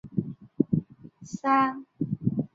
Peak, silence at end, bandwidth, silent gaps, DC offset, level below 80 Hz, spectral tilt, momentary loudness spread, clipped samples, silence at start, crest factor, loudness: -8 dBFS; 0.1 s; 7.8 kHz; none; under 0.1%; -60 dBFS; -7.5 dB/octave; 17 LU; under 0.1%; 0.05 s; 22 dB; -28 LUFS